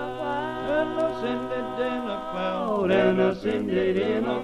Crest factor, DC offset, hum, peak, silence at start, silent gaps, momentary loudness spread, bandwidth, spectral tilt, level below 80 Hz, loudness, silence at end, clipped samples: 16 dB; under 0.1%; none; -8 dBFS; 0 s; none; 8 LU; 10.5 kHz; -7 dB/octave; -52 dBFS; -26 LUFS; 0 s; under 0.1%